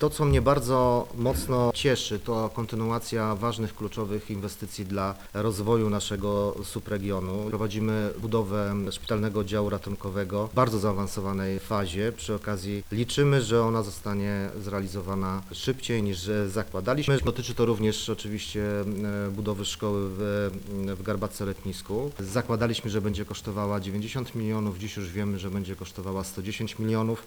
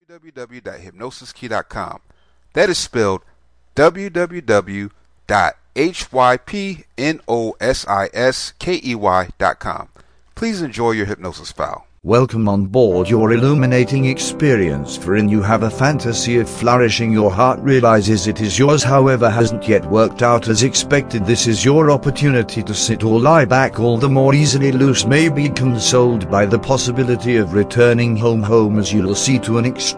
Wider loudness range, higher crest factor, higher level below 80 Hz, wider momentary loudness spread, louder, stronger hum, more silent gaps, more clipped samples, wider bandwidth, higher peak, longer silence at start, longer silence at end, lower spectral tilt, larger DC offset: second, 3 LU vs 6 LU; about the same, 18 dB vs 14 dB; about the same, -44 dBFS vs -42 dBFS; second, 9 LU vs 12 LU; second, -29 LUFS vs -15 LUFS; neither; neither; neither; first, over 20 kHz vs 10.5 kHz; second, -10 dBFS vs 0 dBFS; second, 0 s vs 0.25 s; about the same, 0 s vs 0 s; about the same, -6 dB/octave vs -5 dB/octave; first, 0.1% vs under 0.1%